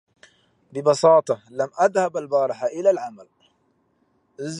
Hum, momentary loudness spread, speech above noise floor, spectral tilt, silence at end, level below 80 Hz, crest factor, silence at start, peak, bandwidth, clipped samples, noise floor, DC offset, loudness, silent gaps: none; 14 LU; 46 dB; -5 dB/octave; 0 s; -76 dBFS; 18 dB; 0.75 s; -4 dBFS; 11 kHz; under 0.1%; -66 dBFS; under 0.1%; -21 LUFS; none